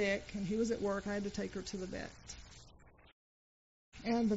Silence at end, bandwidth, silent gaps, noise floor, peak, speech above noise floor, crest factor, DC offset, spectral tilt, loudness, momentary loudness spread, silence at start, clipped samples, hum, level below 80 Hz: 0 s; 8 kHz; 3.12-3.92 s; -61 dBFS; -24 dBFS; 24 dB; 16 dB; under 0.1%; -5 dB/octave; -39 LUFS; 16 LU; 0 s; under 0.1%; none; -60 dBFS